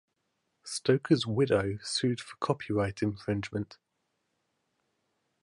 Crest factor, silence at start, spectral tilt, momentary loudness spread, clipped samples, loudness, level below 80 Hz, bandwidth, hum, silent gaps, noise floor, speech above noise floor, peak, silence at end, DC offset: 22 dB; 0.65 s; -5.5 dB/octave; 11 LU; under 0.1%; -30 LUFS; -58 dBFS; 11.5 kHz; none; none; -80 dBFS; 50 dB; -10 dBFS; 1.7 s; under 0.1%